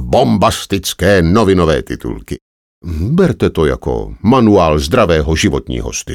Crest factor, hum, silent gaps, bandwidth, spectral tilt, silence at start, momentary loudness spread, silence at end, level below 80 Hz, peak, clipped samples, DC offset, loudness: 12 dB; none; 2.41-2.81 s; 17.5 kHz; -5.5 dB/octave; 0 s; 13 LU; 0 s; -26 dBFS; 0 dBFS; under 0.1%; under 0.1%; -13 LUFS